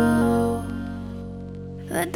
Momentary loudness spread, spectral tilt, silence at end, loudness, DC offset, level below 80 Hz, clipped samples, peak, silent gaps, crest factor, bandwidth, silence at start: 16 LU; -6.5 dB/octave; 0 s; -26 LUFS; under 0.1%; -44 dBFS; under 0.1%; -8 dBFS; none; 16 dB; 16.5 kHz; 0 s